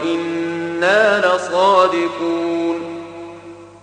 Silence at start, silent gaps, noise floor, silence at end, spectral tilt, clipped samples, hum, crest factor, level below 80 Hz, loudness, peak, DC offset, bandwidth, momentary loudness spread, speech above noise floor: 0 s; none; -37 dBFS; 0.05 s; -4.5 dB/octave; under 0.1%; 50 Hz at -50 dBFS; 16 dB; -64 dBFS; -16 LUFS; -2 dBFS; under 0.1%; 9.6 kHz; 19 LU; 22 dB